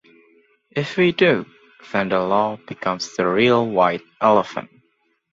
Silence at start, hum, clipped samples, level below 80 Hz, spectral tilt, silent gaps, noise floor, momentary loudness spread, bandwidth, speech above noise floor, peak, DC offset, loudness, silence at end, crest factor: 0.75 s; none; under 0.1%; -60 dBFS; -5.5 dB/octave; none; -66 dBFS; 11 LU; 7.8 kHz; 47 dB; -2 dBFS; under 0.1%; -19 LUFS; 0.7 s; 20 dB